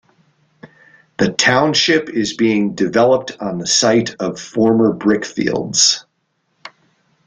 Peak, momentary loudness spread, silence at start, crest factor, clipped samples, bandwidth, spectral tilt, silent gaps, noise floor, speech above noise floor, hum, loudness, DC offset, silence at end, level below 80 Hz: 0 dBFS; 10 LU; 0.65 s; 16 dB; under 0.1%; 10 kHz; -3 dB/octave; none; -67 dBFS; 52 dB; none; -15 LUFS; under 0.1%; 0.6 s; -56 dBFS